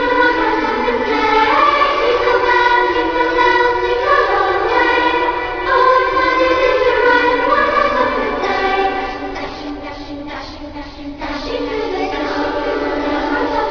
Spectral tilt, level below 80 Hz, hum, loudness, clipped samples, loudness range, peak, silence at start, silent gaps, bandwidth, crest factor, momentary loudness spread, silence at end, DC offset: -4.5 dB/octave; -36 dBFS; none; -15 LUFS; under 0.1%; 9 LU; 0 dBFS; 0 s; none; 5.4 kHz; 14 dB; 15 LU; 0 s; under 0.1%